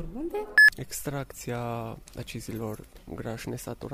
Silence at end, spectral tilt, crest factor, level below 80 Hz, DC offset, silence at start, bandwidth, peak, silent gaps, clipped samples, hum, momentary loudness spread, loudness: 0 s; -4 dB/octave; 20 dB; -50 dBFS; under 0.1%; 0 s; 15.5 kHz; -10 dBFS; none; under 0.1%; none; 22 LU; -25 LUFS